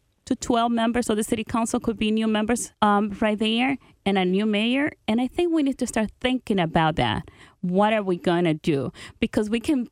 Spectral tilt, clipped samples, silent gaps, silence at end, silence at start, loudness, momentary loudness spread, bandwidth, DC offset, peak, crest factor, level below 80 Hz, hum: -5 dB/octave; under 0.1%; none; 0.05 s; 0.25 s; -23 LUFS; 5 LU; 14.5 kHz; under 0.1%; -4 dBFS; 18 dB; -50 dBFS; none